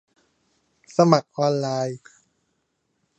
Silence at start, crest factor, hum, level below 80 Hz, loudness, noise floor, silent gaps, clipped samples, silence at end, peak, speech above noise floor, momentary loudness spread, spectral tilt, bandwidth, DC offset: 1 s; 24 dB; none; -72 dBFS; -22 LUFS; -73 dBFS; none; under 0.1%; 1.2 s; 0 dBFS; 52 dB; 12 LU; -6.5 dB/octave; 8.6 kHz; under 0.1%